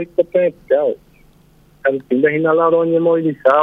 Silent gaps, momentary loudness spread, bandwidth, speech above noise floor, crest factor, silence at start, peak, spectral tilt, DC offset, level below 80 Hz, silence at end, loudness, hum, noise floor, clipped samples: none; 7 LU; 3.9 kHz; 35 dB; 16 dB; 0 s; 0 dBFS; -9 dB/octave; under 0.1%; -56 dBFS; 0 s; -16 LUFS; 50 Hz at -50 dBFS; -50 dBFS; under 0.1%